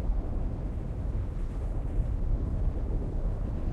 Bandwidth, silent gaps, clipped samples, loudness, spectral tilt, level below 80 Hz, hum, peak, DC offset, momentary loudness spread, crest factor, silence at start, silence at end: 3.5 kHz; none; under 0.1%; -34 LUFS; -9.5 dB/octave; -30 dBFS; none; -18 dBFS; under 0.1%; 4 LU; 12 dB; 0 s; 0 s